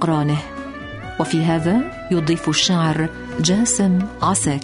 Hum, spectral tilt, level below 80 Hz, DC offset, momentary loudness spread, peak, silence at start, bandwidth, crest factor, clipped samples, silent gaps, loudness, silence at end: none; -4.5 dB/octave; -42 dBFS; under 0.1%; 13 LU; -4 dBFS; 0 s; 11 kHz; 16 dB; under 0.1%; none; -19 LUFS; 0 s